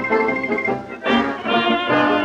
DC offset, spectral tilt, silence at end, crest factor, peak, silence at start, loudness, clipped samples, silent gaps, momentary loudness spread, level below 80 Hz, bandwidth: under 0.1%; -5.5 dB/octave; 0 s; 14 dB; -4 dBFS; 0 s; -19 LUFS; under 0.1%; none; 5 LU; -52 dBFS; 8.8 kHz